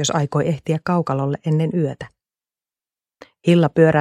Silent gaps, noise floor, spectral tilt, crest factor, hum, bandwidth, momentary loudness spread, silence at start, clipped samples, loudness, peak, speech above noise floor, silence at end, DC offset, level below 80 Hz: none; under -90 dBFS; -6 dB/octave; 18 dB; none; 9.8 kHz; 10 LU; 0 s; under 0.1%; -19 LUFS; -2 dBFS; over 72 dB; 0 s; under 0.1%; -56 dBFS